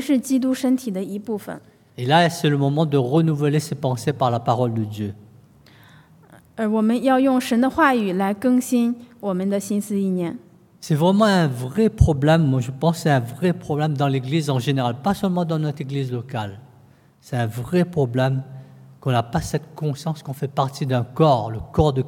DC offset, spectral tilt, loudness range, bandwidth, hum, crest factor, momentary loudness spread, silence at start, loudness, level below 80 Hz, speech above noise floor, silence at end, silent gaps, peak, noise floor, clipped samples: under 0.1%; -6.5 dB/octave; 5 LU; 17 kHz; none; 20 dB; 11 LU; 0 s; -21 LUFS; -42 dBFS; 32 dB; 0 s; none; -2 dBFS; -52 dBFS; under 0.1%